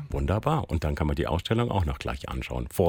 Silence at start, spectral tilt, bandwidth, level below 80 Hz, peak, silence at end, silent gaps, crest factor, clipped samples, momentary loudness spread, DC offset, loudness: 0 s; -7 dB/octave; 17 kHz; -36 dBFS; -8 dBFS; 0 s; none; 18 dB; under 0.1%; 7 LU; under 0.1%; -28 LUFS